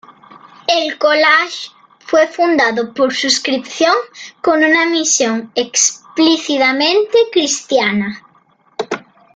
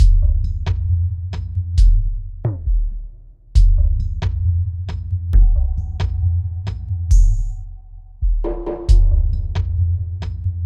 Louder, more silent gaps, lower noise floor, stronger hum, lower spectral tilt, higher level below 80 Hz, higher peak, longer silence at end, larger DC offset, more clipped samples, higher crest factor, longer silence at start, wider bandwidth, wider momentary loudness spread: first, -14 LUFS vs -20 LUFS; neither; first, -53 dBFS vs -38 dBFS; neither; second, -1.5 dB/octave vs -7.5 dB/octave; second, -62 dBFS vs -18 dBFS; about the same, 0 dBFS vs -2 dBFS; first, 0.35 s vs 0 s; neither; neither; about the same, 16 dB vs 14 dB; first, 0.35 s vs 0 s; first, 10 kHz vs 7.2 kHz; first, 13 LU vs 10 LU